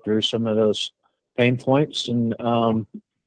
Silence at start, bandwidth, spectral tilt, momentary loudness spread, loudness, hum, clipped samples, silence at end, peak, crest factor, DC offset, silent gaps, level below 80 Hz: 0.05 s; 9.6 kHz; -6 dB/octave; 8 LU; -22 LUFS; none; under 0.1%; 0.25 s; -6 dBFS; 16 dB; under 0.1%; none; -64 dBFS